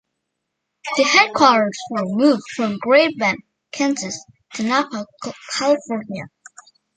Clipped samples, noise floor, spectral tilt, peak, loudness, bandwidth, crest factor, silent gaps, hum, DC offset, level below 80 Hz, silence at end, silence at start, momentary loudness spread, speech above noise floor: under 0.1%; -77 dBFS; -3.5 dB/octave; -2 dBFS; -18 LUFS; 9.4 kHz; 18 dB; none; none; under 0.1%; -66 dBFS; 0.7 s; 0.85 s; 19 LU; 59 dB